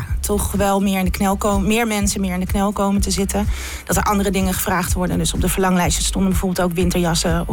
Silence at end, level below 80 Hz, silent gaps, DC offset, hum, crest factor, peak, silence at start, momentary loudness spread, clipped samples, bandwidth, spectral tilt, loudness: 0 s; -26 dBFS; none; under 0.1%; none; 10 dB; -8 dBFS; 0 s; 3 LU; under 0.1%; 18 kHz; -4.5 dB/octave; -19 LUFS